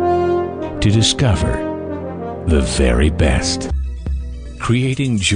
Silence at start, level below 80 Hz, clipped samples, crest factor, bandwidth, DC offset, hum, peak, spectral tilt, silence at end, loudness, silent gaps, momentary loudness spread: 0 s; -24 dBFS; under 0.1%; 14 dB; 10 kHz; under 0.1%; none; -2 dBFS; -5 dB/octave; 0 s; -18 LUFS; none; 12 LU